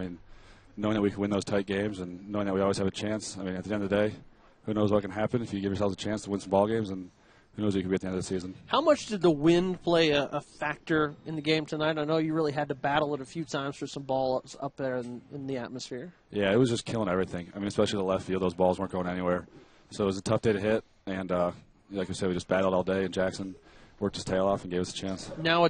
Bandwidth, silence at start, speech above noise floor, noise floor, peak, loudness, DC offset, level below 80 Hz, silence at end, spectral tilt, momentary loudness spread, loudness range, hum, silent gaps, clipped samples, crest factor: 9.6 kHz; 0 s; 23 dB; -52 dBFS; -10 dBFS; -30 LUFS; under 0.1%; -58 dBFS; 0 s; -5.5 dB/octave; 11 LU; 4 LU; none; none; under 0.1%; 20 dB